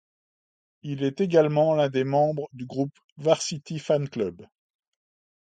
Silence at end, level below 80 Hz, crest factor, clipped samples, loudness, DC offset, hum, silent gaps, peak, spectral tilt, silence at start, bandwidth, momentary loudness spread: 1 s; -68 dBFS; 22 dB; under 0.1%; -25 LUFS; under 0.1%; none; 3.04-3.16 s; -6 dBFS; -6 dB/octave; 0.85 s; 9.4 kHz; 12 LU